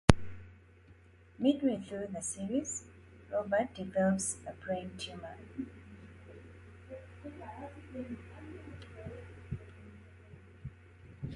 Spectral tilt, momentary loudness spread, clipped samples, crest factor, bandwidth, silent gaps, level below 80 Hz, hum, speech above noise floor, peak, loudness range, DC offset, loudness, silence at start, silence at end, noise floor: -5.5 dB/octave; 23 LU; under 0.1%; 36 dB; 11.5 kHz; none; -50 dBFS; none; 24 dB; 0 dBFS; 13 LU; under 0.1%; -37 LUFS; 0.1 s; 0 s; -59 dBFS